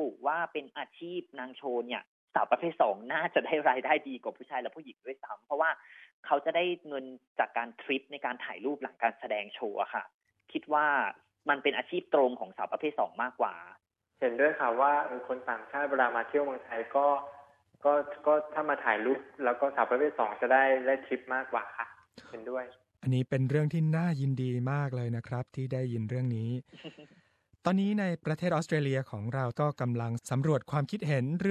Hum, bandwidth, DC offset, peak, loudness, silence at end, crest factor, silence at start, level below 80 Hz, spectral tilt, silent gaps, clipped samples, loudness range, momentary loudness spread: none; 11.5 kHz; under 0.1%; -10 dBFS; -31 LUFS; 0 s; 20 dB; 0 s; -74 dBFS; -7 dB/octave; 2.07-2.28 s, 6.13-6.23 s, 7.27-7.36 s, 10.14-10.20 s; under 0.1%; 5 LU; 13 LU